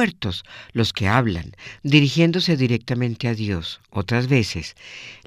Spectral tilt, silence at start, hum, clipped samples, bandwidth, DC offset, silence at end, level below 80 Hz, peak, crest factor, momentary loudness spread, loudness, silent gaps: -6 dB/octave; 0 s; none; under 0.1%; 15 kHz; under 0.1%; 0.1 s; -46 dBFS; -2 dBFS; 20 dB; 14 LU; -21 LUFS; none